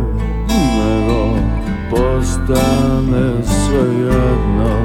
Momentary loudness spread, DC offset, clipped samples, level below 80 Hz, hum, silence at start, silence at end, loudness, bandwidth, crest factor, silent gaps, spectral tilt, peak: 4 LU; under 0.1%; under 0.1%; -20 dBFS; none; 0 s; 0 s; -15 LUFS; 16.5 kHz; 12 dB; none; -6.5 dB/octave; 0 dBFS